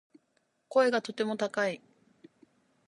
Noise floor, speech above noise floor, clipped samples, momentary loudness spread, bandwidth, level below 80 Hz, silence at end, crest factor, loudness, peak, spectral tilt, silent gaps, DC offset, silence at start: -75 dBFS; 46 dB; under 0.1%; 7 LU; 11.5 kHz; -86 dBFS; 1.1 s; 20 dB; -30 LUFS; -12 dBFS; -4.5 dB/octave; none; under 0.1%; 0.7 s